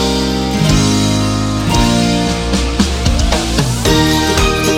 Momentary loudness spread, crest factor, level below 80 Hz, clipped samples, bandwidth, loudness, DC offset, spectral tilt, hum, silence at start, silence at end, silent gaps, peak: 4 LU; 12 dB; -20 dBFS; under 0.1%; 16.5 kHz; -13 LUFS; 0.1%; -4.5 dB/octave; none; 0 s; 0 s; none; 0 dBFS